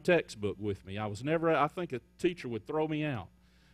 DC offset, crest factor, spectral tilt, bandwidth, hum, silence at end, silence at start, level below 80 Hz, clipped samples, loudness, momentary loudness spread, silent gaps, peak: under 0.1%; 18 dB; -6.5 dB/octave; 13.5 kHz; none; 0.5 s; 0 s; -64 dBFS; under 0.1%; -33 LUFS; 11 LU; none; -14 dBFS